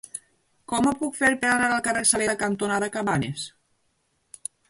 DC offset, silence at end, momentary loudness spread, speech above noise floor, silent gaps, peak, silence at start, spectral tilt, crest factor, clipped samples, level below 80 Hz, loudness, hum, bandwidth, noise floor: under 0.1%; 1.2 s; 17 LU; 47 dB; none; -6 dBFS; 0.15 s; -3 dB/octave; 20 dB; under 0.1%; -56 dBFS; -23 LUFS; none; 12 kHz; -71 dBFS